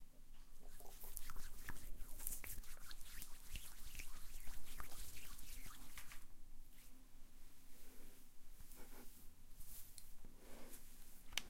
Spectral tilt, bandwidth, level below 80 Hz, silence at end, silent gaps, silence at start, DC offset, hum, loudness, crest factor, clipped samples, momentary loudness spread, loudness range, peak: -2 dB/octave; 16.5 kHz; -54 dBFS; 0 s; none; 0 s; under 0.1%; none; -57 LUFS; 26 dB; under 0.1%; 14 LU; 9 LU; -20 dBFS